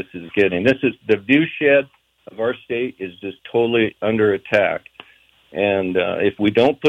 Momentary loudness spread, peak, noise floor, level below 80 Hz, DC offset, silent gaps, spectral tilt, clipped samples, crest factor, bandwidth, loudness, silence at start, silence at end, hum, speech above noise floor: 13 LU; -4 dBFS; -53 dBFS; -58 dBFS; under 0.1%; none; -7 dB/octave; under 0.1%; 16 dB; 8 kHz; -19 LUFS; 0 s; 0 s; none; 35 dB